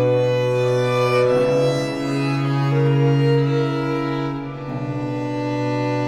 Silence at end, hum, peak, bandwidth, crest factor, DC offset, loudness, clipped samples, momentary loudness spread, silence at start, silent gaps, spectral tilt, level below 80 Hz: 0 s; none; -6 dBFS; 11 kHz; 12 dB; under 0.1%; -20 LUFS; under 0.1%; 8 LU; 0 s; none; -7.5 dB/octave; -48 dBFS